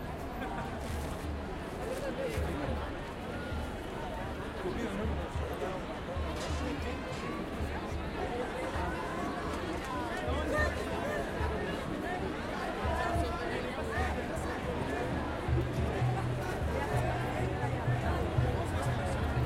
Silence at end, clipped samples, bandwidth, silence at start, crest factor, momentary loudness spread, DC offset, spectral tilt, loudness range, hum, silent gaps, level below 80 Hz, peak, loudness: 0 s; under 0.1%; 16 kHz; 0 s; 18 dB; 6 LU; under 0.1%; -6 dB/octave; 4 LU; none; none; -42 dBFS; -16 dBFS; -35 LUFS